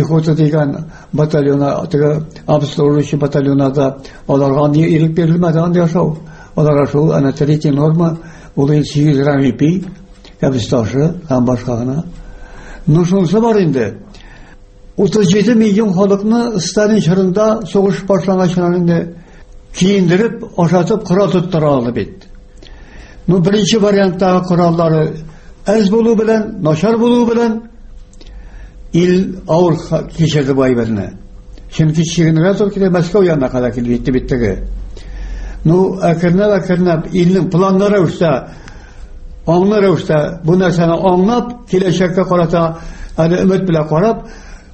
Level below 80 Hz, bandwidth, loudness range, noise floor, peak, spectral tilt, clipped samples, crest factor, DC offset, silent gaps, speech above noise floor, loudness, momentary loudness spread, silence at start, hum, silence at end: -34 dBFS; 8.6 kHz; 3 LU; -37 dBFS; 0 dBFS; -7 dB/octave; under 0.1%; 12 dB; under 0.1%; none; 25 dB; -13 LUFS; 8 LU; 0 s; none; 0.15 s